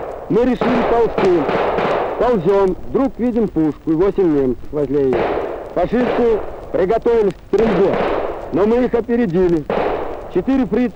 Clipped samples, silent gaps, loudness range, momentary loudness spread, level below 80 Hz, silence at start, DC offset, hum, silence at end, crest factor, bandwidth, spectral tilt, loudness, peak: under 0.1%; none; 1 LU; 6 LU; -36 dBFS; 0 s; under 0.1%; none; 0 s; 12 dB; 8.4 kHz; -8 dB/octave; -17 LUFS; -4 dBFS